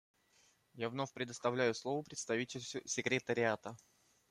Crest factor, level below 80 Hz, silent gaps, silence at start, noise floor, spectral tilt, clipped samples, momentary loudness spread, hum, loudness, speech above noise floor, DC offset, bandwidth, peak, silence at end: 20 dB; -80 dBFS; none; 0.75 s; -72 dBFS; -4 dB/octave; under 0.1%; 9 LU; none; -38 LUFS; 34 dB; under 0.1%; 13.5 kHz; -20 dBFS; 0.55 s